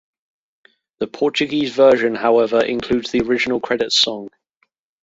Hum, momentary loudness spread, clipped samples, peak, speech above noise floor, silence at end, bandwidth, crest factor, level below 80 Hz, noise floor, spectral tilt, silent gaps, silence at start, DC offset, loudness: none; 8 LU; under 0.1%; -2 dBFS; 50 dB; 0.75 s; 8 kHz; 16 dB; -52 dBFS; -67 dBFS; -3.5 dB/octave; none; 1 s; under 0.1%; -17 LUFS